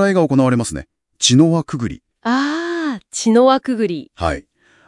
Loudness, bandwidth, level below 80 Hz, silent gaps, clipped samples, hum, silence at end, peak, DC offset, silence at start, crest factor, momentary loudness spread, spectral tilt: -17 LUFS; 12 kHz; -44 dBFS; none; under 0.1%; none; 0.45 s; 0 dBFS; under 0.1%; 0 s; 16 dB; 13 LU; -5 dB/octave